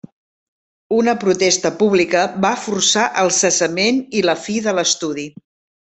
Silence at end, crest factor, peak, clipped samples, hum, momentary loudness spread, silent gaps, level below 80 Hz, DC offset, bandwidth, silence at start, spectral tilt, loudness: 0.55 s; 16 dB; -2 dBFS; under 0.1%; none; 6 LU; none; -60 dBFS; under 0.1%; 8.4 kHz; 0.9 s; -2.5 dB/octave; -16 LUFS